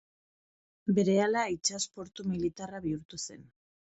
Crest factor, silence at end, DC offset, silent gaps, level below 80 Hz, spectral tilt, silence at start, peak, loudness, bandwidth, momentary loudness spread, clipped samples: 18 dB; 0.55 s; under 0.1%; 3.05-3.09 s; -64 dBFS; -4.5 dB/octave; 0.85 s; -16 dBFS; -32 LUFS; 8.2 kHz; 13 LU; under 0.1%